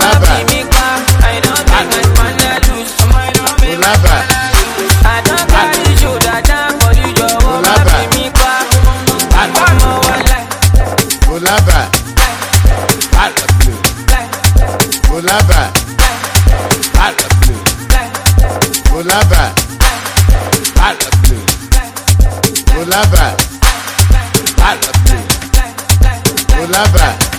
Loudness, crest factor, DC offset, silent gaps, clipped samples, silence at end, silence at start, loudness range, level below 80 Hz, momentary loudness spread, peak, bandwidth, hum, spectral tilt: -10 LUFS; 8 dB; under 0.1%; none; 4%; 0 s; 0 s; 2 LU; -12 dBFS; 4 LU; 0 dBFS; over 20 kHz; none; -3.5 dB/octave